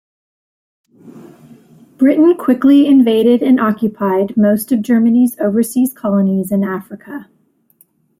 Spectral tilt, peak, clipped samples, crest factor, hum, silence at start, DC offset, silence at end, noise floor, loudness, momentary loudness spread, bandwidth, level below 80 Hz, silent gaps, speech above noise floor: -7 dB/octave; -2 dBFS; under 0.1%; 12 dB; none; 1.05 s; under 0.1%; 0.95 s; -54 dBFS; -13 LUFS; 10 LU; 16 kHz; -60 dBFS; none; 42 dB